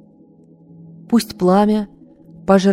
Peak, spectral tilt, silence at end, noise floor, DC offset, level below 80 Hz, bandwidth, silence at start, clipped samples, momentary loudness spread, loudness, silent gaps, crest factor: 0 dBFS; -6.5 dB/octave; 0 s; -48 dBFS; under 0.1%; -52 dBFS; 15.5 kHz; 1.1 s; under 0.1%; 13 LU; -16 LUFS; none; 18 dB